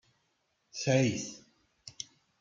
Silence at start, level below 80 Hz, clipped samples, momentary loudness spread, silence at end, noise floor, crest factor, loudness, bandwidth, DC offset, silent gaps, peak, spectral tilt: 0.75 s; -70 dBFS; under 0.1%; 24 LU; 0.35 s; -77 dBFS; 20 dB; -31 LUFS; 9 kHz; under 0.1%; none; -14 dBFS; -5 dB/octave